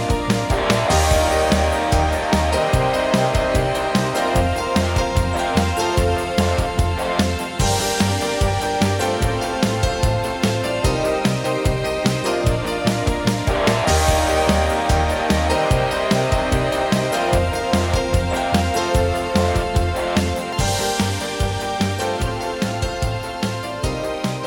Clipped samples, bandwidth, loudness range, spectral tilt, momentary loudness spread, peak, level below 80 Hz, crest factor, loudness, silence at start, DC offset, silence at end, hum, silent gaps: under 0.1%; 17.5 kHz; 3 LU; -5 dB/octave; 5 LU; -4 dBFS; -28 dBFS; 16 dB; -19 LUFS; 0 s; under 0.1%; 0 s; none; none